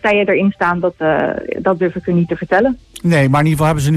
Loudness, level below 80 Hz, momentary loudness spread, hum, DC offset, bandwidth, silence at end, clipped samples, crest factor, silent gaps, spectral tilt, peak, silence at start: -15 LUFS; -42 dBFS; 5 LU; none; under 0.1%; 14 kHz; 0 s; under 0.1%; 12 dB; none; -7 dB/octave; -2 dBFS; 0.05 s